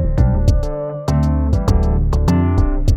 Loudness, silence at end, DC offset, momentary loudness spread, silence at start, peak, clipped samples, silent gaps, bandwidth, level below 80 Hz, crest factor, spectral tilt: -17 LUFS; 0 s; under 0.1%; 5 LU; 0 s; -2 dBFS; under 0.1%; none; 9.2 kHz; -18 dBFS; 12 dB; -8 dB/octave